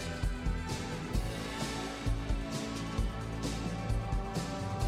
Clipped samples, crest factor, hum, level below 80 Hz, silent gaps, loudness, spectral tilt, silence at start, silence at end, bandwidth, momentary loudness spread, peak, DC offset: under 0.1%; 14 dB; none; -38 dBFS; none; -37 LUFS; -5.5 dB/octave; 0 s; 0 s; 15.5 kHz; 2 LU; -20 dBFS; under 0.1%